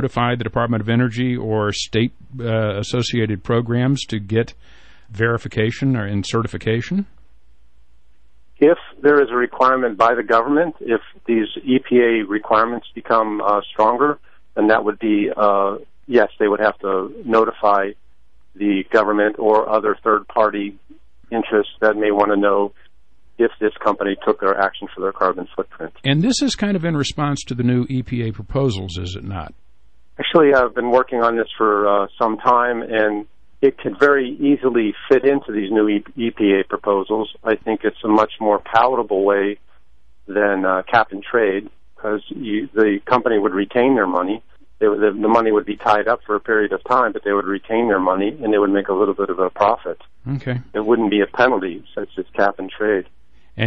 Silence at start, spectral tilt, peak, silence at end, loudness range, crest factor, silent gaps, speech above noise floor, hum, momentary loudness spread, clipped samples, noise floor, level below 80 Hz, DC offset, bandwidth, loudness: 0 s; -6 dB/octave; -2 dBFS; 0 s; 4 LU; 16 dB; none; 41 dB; none; 9 LU; under 0.1%; -59 dBFS; -50 dBFS; 0.9%; 8.8 kHz; -18 LUFS